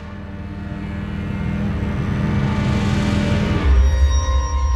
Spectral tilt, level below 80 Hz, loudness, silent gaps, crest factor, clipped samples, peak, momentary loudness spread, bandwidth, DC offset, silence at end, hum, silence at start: -6.5 dB/octave; -22 dBFS; -20 LUFS; none; 14 dB; under 0.1%; -4 dBFS; 13 LU; 8.6 kHz; under 0.1%; 0 s; none; 0 s